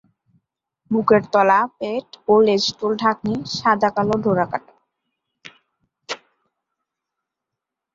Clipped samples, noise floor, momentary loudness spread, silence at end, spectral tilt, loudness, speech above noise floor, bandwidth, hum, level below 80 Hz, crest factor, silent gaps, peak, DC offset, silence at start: under 0.1%; -84 dBFS; 14 LU; 1.8 s; -5 dB/octave; -19 LUFS; 66 dB; 7.6 kHz; none; -58 dBFS; 20 dB; none; -2 dBFS; under 0.1%; 0.9 s